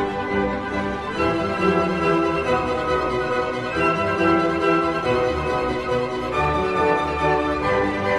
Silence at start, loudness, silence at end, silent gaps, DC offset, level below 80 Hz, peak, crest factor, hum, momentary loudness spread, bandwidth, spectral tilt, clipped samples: 0 s; -21 LUFS; 0 s; none; under 0.1%; -40 dBFS; -6 dBFS; 14 dB; none; 4 LU; 12 kHz; -6.5 dB/octave; under 0.1%